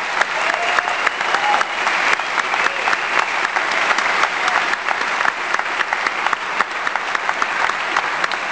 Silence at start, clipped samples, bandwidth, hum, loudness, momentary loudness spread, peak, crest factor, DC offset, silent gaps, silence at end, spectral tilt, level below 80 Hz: 0 s; under 0.1%; 10 kHz; none; -18 LUFS; 3 LU; 0 dBFS; 18 dB; 0.2%; none; 0 s; -0.5 dB/octave; -58 dBFS